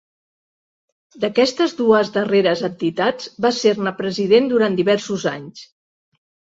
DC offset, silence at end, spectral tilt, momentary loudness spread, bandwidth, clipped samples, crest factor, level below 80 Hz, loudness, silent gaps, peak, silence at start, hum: under 0.1%; 0.95 s; -5 dB/octave; 8 LU; 7.8 kHz; under 0.1%; 18 dB; -64 dBFS; -18 LUFS; none; -2 dBFS; 1.15 s; none